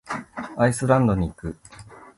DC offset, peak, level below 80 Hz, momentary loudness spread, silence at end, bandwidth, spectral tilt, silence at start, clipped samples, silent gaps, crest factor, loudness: under 0.1%; -4 dBFS; -42 dBFS; 17 LU; 0.15 s; 11.5 kHz; -7 dB/octave; 0.05 s; under 0.1%; none; 20 dB; -22 LUFS